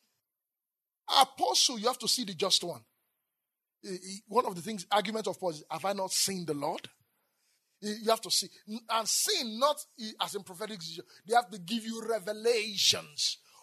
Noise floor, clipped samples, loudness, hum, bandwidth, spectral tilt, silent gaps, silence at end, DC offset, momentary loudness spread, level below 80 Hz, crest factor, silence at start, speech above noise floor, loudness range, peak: under -90 dBFS; under 0.1%; -30 LUFS; none; 13.5 kHz; -1.5 dB/octave; none; 0.25 s; under 0.1%; 16 LU; -88 dBFS; 26 dB; 1.1 s; over 58 dB; 4 LU; -8 dBFS